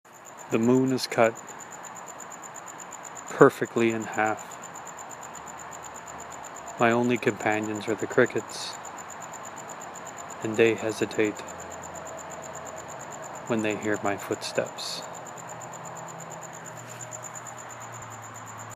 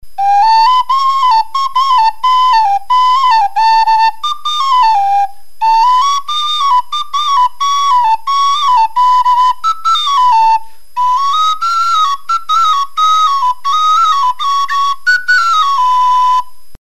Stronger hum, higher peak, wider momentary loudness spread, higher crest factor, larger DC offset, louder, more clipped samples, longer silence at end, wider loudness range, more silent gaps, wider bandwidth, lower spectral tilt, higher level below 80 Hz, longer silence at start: neither; about the same, -2 dBFS vs 0 dBFS; first, 16 LU vs 5 LU; first, 28 dB vs 10 dB; second, under 0.1% vs 7%; second, -28 LUFS vs -10 LUFS; neither; second, 0 s vs 0.15 s; first, 8 LU vs 2 LU; neither; first, 15.5 kHz vs 13.5 kHz; first, -4.5 dB/octave vs 2.5 dB/octave; second, -70 dBFS vs -52 dBFS; second, 0.05 s vs 0.2 s